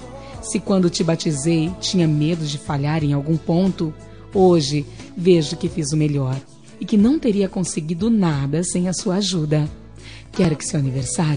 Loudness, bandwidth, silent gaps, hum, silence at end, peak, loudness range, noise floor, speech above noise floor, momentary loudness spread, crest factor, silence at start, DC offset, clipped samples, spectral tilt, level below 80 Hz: -20 LUFS; 10 kHz; none; none; 0 s; -4 dBFS; 2 LU; -39 dBFS; 20 dB; 11 LU; 16 dB; 0 s; 0.4%; under 0.1%; -6 dB/octave; -44 dBFS